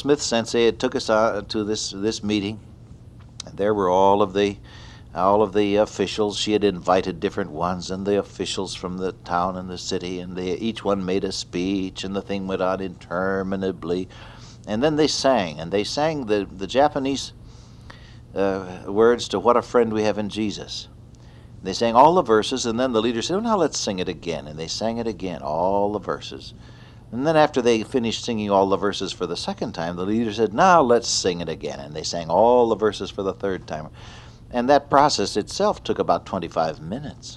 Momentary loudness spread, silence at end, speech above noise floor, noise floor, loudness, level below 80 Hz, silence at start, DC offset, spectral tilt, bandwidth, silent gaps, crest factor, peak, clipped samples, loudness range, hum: 12 LU; 0 s; 22 dB; -44 dBFS; -22 LUFS; -48 dBFS; 0 s; under 0.1%; -4.5 dB/octave; 11.5 kHz; none; 20 dB; -2 dBFS; under 0.1%; 5 LU; none